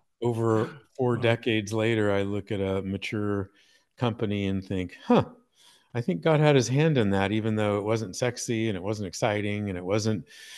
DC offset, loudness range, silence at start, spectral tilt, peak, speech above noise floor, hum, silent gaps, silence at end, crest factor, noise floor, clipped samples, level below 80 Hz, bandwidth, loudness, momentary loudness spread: under 0.1%; 4 LU; 0.2 s; -6 dB/octave; -6 dBFS; 34 dB; none; none; 0 s; 20 dB; -60 dBFS; under 0.1%; -64 dBFS; 12.5 kHz; -27 LUFS; 9 LU